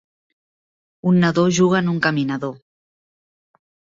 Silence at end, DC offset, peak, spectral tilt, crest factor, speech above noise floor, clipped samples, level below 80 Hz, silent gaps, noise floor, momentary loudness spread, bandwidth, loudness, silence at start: 1.4 s; under 0.1%; -4 dBFS; -6 dB/octave; 18 dB; over 73 dB; under 0.1%; -60 dBFS; none; under -90 dBFS; 10 LU; 7.6 kHz; -18 LUFS; 1.05 s